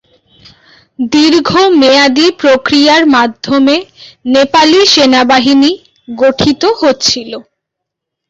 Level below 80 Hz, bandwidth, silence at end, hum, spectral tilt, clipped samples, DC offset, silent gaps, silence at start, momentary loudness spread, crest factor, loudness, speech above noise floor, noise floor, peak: -46 dBFS; 8 kHz; 0.9 s; none; -3 dB/octave; under 0.1%; under 0.1%; none; 1 s; 10 LU; 10 dB; -8 LUFS; 68 dB; -76 dBFS; 0 dBFS